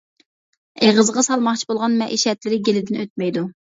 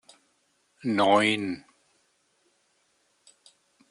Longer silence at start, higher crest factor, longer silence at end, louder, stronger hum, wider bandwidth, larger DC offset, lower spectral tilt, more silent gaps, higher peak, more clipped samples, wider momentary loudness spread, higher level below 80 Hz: about the same, 0.8 s vs 0.85 s; about the same, 18 dB vs 22 dB; second, 0.15 s vs 2.3 s; first, -19 LUFS vs -24 LUFS; neither; second, 8 kHz vs 11 kHz; neither; about the same, -3.5 dB/octave vs -4.5 dB/octave; first, 3.10-3.16 s vs none; first, -2 dBFS vs -8 dBFS; neither; second, 8 LU vs 15 LU; first, -66 dBFS vs -76 dBFS